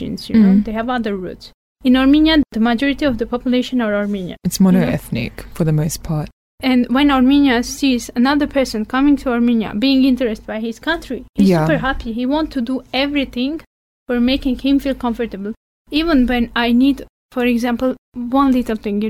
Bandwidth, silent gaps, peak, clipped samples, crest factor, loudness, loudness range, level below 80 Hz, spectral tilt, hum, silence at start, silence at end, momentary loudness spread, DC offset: 16 kHz; 1.54-1.76 s, 6.33-6.58 s, 11.29-11.33 s, 13.67-14.06 s, 15.57-15.85 s, 17.09-17.29 s, 17.98-18.12 s; -4 dBFS; under 0.1%; 12 dB; -17 LUFS; 4 LU; -36 dBFS; -6 dB/octave; none; 0 s; 0 s; 11 LU; under 0.1%